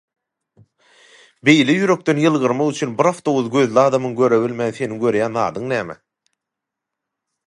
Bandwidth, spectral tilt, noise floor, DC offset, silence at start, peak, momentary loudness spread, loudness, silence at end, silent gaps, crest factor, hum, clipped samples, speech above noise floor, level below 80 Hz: 11.5 kHz; -5.5 dB/octave; -83 dBFS; under 0.1%; 1.45 s; 0 dBFS; 9 LU; -17 LUFS; 1.55 s; none; 18 dB; none; under 0.1%; 66 dB; -64 dBFS